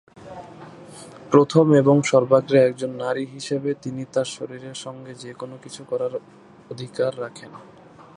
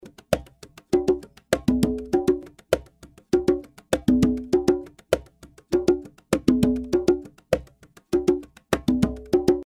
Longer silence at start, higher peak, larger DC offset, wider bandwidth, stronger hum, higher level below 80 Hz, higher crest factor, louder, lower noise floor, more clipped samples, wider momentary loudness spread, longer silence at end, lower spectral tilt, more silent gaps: first, 0.25 s vs 0.05 s; about the same, -2 dBFS vs -2 dBFS; neither; second, 11 kHz vs 16.5 kHz; neither; second, -66 dBFS vs -42 dBFS; about the same, 22 dB vs 22 dB; first, -20 LUFS vs -24 LUFS; second, -42 dBFS vs -52 dBFS; neither; first, 25 LU vs 7 LU; first, 0.55 s vs 0 s; about the same, -6.5 dB/octave vs -6.5 dB/octave; neither